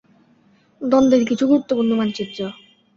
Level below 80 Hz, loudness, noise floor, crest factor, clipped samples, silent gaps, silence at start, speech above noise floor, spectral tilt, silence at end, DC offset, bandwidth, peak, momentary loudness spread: -56 dBFS; -18 LUFS; -56 dBFS; 16 dB; under 0.1%; none; 0.8 s; 39 dB; -6 dB/octave; 0.45 s; under 0.1%; 7.4 kHz; -4 dBFS; 14 LU